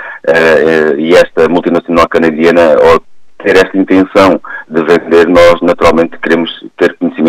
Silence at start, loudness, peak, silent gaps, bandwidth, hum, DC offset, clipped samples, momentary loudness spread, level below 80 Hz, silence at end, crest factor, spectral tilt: 0 s; -8 LUFS; 0 dBFS; none; 14 kHz; none; under 0.1%; 0.3%; 7 LU; -36 dBFS; 0 s; 8 dB; -5.5 dB/octave